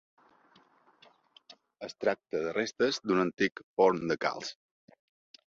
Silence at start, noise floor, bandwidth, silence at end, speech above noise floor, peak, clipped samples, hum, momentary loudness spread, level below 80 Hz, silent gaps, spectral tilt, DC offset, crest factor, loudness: 1.5 s; -64 dBFS; 7.6 kHz; 0.95 s; 34 dB; -12 dBFS; under 0.1%; none; 14 LU; -72 dBFS; 3.63-3.77 s; -4.5 dB/octave; under 0.1%; 22 dB; -30 LUFS